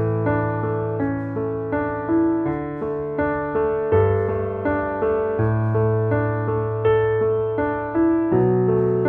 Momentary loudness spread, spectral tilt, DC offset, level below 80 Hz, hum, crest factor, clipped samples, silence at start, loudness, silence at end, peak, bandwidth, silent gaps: 6 LU; -11.5 dB/octave; under 0.1%; -44 dBFS; none; 16 dB; under 0.1%; 0 s; -21 LUFS; 0 s; -4 dBFS; 3.5 kHz; none